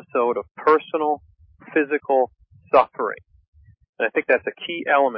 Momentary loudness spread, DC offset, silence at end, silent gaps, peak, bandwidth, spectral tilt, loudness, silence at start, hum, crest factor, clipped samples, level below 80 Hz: 9 LU; under 0.1%; 0 s; 0.51-0.55 s, 3.48-3.53 s, 3.89-3.93 s; -4 dBFS; 5.6 kHz; -9 dB/octave; -22 LUFS; 0.15 s; none; 18 dB; under 0.1%; -60 dBFS